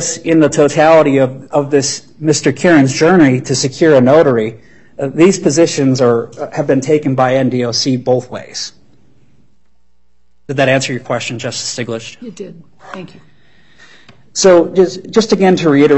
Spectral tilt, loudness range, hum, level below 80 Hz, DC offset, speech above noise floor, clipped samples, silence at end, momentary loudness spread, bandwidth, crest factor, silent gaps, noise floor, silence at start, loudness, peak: -5 dB/octave; 9 LU; none; -50 dBFS; 0.7%; 49 dB; under 0.1%; 0 s; 15 LU; 8.6 kHz; 12 dB; none; -61 dBFS; 0 s; -12 LUFS; 0 dBFS